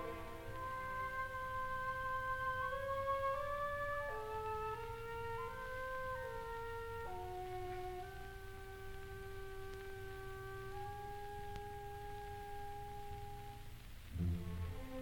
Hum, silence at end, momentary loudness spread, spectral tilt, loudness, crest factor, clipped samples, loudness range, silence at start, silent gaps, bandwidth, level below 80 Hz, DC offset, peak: none; 0 s; 11 LU; -5.5 dB/octave; -45 LUFS; 16 dB; under 0.1%; 9 LU; 0 s; none; 19 kHz; -54 dBFS; under 0.1%; -28 dBFS